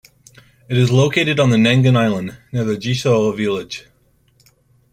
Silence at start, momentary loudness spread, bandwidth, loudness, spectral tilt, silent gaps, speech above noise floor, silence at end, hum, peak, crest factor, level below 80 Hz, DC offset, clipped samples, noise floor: 0.7 s; 12 LU; 10.5 kHz; -16 LUFS; -6 dB/octave; none; 41 dB; 1.1 s; none; -2 dBFS; 14 dB; -52 dBFS; under 0.1%; under 0.1%; -57 dBFS